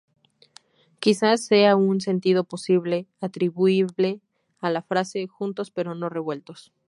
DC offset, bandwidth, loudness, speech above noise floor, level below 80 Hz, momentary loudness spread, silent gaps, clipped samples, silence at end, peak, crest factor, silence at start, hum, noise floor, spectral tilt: under 0.1%; 11.5 kHz; -23 LUFS; 33 dB; -74 dBFS; 12 LU; none; under 0.1%; 0.3 s; -4 dBFS; 20 dB; 1 s; none; -55 dBFS; -5.5 dB/octave